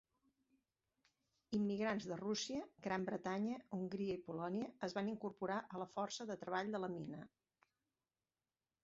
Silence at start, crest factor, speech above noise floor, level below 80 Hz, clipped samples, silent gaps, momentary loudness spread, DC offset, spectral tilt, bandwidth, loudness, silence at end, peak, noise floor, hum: 1.5 s; 18 dB; over 47 dB; -80 dBFS; under 0.1%; none; 6 LU; under 0.1%; -4.5 dB/octave; 7.6 kHz; -44 LUFS; 1.55 s; -26 dBFS; under -90 dBFS; none